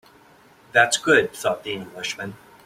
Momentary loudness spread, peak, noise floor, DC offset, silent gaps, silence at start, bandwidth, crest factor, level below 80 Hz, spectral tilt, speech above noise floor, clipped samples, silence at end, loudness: 14 LU; -2 dBFS; -52 dBFS; under 0.1%; none; 0.75 s; 16 kHz; 20 dB; -64 dBFS; -2.5 dB/octave; 31 dB; under 0.1%; 0.3 s; -21 LUFS